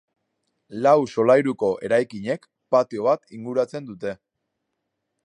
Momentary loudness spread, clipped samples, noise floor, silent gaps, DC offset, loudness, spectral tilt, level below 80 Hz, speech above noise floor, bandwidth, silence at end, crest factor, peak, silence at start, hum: 14 LU; under 0.1%; -79 dBFS; none; under 0.1%; -22 LUFS; -6.5 dB/octave; -68 dBFS; 57 dB; 10 kHz; 1.1 s; 18 dB; -6 dBFS; 0.7 s; none